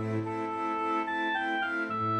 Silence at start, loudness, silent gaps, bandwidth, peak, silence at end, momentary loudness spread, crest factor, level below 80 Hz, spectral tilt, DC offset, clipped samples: 0 s; -31 LUFS; none; 10 kHz; -20 dBFS; 0 s; 3 LU; 10 dB; -72 dBFS; -6.5 dB/octave; under 0.1%; under 0.1%